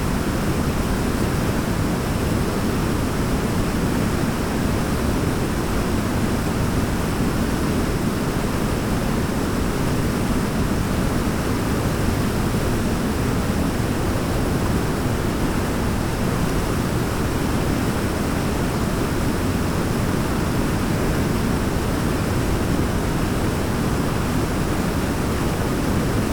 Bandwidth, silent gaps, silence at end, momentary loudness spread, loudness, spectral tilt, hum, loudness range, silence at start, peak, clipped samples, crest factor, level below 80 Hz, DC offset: over 20 kHz; none; 0 s; 1 LU; -22 LUFS; -6 dB/octave; none; 0 LU; 0 s; -8 dBFS; under 0.1%; 14 dB; -28 dBFS; under 0.1%